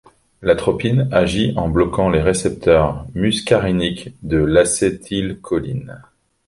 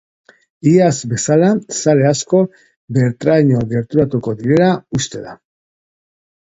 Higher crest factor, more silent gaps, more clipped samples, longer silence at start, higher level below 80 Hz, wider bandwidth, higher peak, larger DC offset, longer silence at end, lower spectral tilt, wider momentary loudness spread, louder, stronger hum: about the same, 16 dB vs 16 dB; second, none vs 2.76-2.88 s; neither; second, 0.4 s vs 0.65 s; first, -34 dBFS vs -50 dBFS; first, 11.5 kHz vs 8 kHz; about the same, -2 dBFS vs 0 dBFS; neither; second, 0.45 s vs 1.15 s; about the same, -5.5 dB/octave vs -6 dB/octave; about the same, 9 LU vs 8 LU; about the same, -17 LUFS vs -15 LUFS; neither